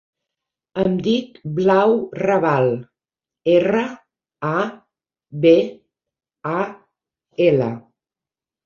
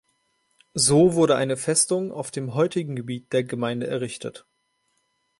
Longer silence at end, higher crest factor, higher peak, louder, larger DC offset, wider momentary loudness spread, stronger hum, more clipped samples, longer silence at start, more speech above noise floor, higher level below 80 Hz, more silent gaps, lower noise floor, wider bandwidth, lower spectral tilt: second, 0.85 s vs 1 s; about the same, 18 dB vs 20 dB; first, -2 dBFS vs -6 dBFS; first, -19 LUFS vs -23 LUFS; neither; about the same, 14 LU vs 14 LU; neither; neither; about the same, 0.75 s vs 0.75 s; first, 72 dB vs 49 dB; about the same, -60 dBFS vs -62 dBFS; neither; first, -90 dBFS vs -71 dBFS; second, 7 kHz vs 11.5 kHz; first, -7.5 dB/octave vs -4.5 dB/octave